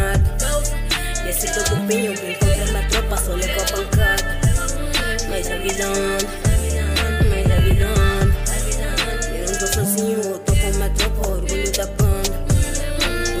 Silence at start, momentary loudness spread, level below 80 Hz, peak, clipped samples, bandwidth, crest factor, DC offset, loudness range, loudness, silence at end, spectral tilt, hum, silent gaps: 0 s; 5 LU; -22 dBFS; -6 dBFS; under 0.1%; 16 kHz; 12 dB; under 0.1%; 2 LU; -20 LUFS; 0 s; -4 dB/octave; none; none